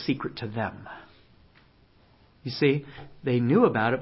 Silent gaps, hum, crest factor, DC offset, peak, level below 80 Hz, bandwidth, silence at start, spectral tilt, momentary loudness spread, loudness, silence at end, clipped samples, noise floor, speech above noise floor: none; none; 22 dB; under 0.1%; -6 dBFS; -60 dBFS; 5.8 kHz; 0 s; -10.5 dB/octave; 23 LU; -26 LUFS; 0 s; under 0.1%; -59 dBFS; 33 dB